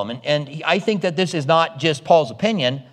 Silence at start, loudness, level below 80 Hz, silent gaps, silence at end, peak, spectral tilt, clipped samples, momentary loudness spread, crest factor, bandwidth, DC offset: 0 s; -19 LUFS; -68 dBFS; none; 0.1 s; -2 dBFS; -5 dB/octave; under 0.1%; 6 LU; 18 dB; 11 kHz; under 0.1%